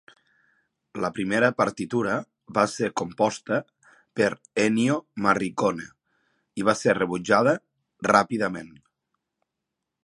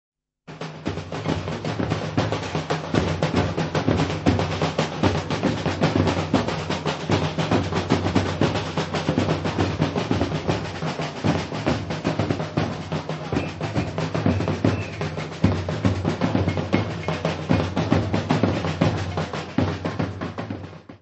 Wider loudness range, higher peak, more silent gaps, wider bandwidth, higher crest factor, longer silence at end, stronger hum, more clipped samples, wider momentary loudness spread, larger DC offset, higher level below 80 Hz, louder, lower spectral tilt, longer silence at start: about the same, 2 LU vs 3 LU; about the same, -4 dBFS vs -2 dBFS; neither; first, 11.5 kHz vs 8.4 kHz; about the same, 22 dB vs 20 dB; first, 1.35 s vs 0.05 s; neither; neither; first, 10 LU vs 6 LU; neither; second, -64 dBFS vs -44 dBFS; about the same, -24 LUFS vs -24 LUFS; second, -5 dB/octave vs -6.5 dB/octave; first, 0.95 s vs 0.5 s